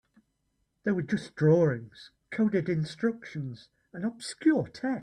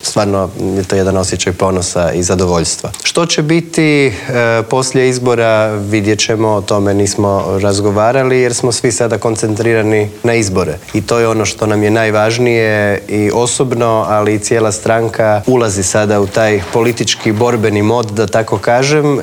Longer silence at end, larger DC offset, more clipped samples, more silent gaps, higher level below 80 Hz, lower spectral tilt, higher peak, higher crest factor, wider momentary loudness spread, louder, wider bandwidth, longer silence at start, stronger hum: about the same, 0 s vs 0 s; neither; neither; neither; second, -66 dBFS vs -46 dBFS; first, -7 dB/octave vs -4.5 dB/octave; second, -12 dBFS vs 0 dBFS; about the same, 16 dB vs 12 dB; first, 14 LU vs 3 LU; second, -29 LUFS vs -12 LUFS; second, 11 kHz vs 19.5 kHz; first, 0.85 s vs 0 s; neither